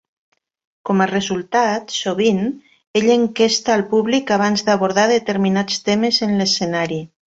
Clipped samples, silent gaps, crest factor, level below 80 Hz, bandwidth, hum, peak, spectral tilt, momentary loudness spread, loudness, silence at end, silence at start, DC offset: under 0.1%; 2.87-2.94 s; 16 dB; -58 dBFS; 8 kHz; none; -2 dBFS; -4.5 dB/octave; 6 LU; -17 LUFS; 0.25 s; 0.85 s; under 0.1%